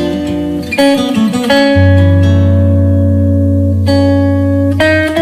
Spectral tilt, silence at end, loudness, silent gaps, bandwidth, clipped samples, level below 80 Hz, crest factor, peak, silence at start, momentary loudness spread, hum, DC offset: -7 dB/octave; 0 s; -10 LUFS; none; 13.5 kHz; under 0.1%; -32 dBFS; 10 dB; 0 dBFS; 0 s; 5 LU; none; under 0.1%